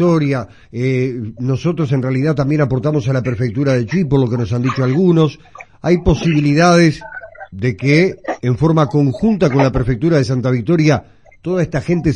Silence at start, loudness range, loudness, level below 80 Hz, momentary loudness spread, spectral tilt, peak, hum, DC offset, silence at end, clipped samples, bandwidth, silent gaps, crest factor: 0 s; 3 LU; -15 LUFS; -34 dBFS; 9 LU; -7.5 dB/octave; 0 dBFS; none; 0.3%; 0 s; under 0.1%; 9.4 kHz; none; 14 dB